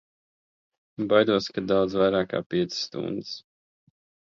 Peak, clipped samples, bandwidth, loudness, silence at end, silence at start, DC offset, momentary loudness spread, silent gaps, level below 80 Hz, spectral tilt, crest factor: -6 dBFS; under 0.1%; 7.6 kHz; -25 LUFS; 0.95 s; 1 s; under 0.1%; 14 LU; 2.46-2.50 s; -60 dBFS; -5.5 dB/octave; 22 dB